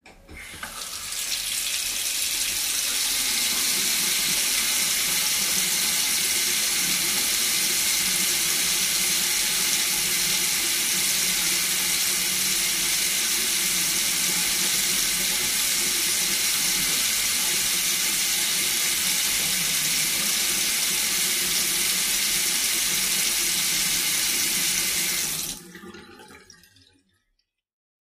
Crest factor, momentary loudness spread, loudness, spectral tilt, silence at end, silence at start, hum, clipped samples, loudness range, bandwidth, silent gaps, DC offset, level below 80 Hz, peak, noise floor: 18 dB; 3 LU; -21 LUFS; 1 dB/octave; 1.8 s; 0.05 s; none; under 0.1%; 3 LU; 15.5 kHz; none; under 0.1%; -54 dBFS; -8 dBFS; -75 dBFS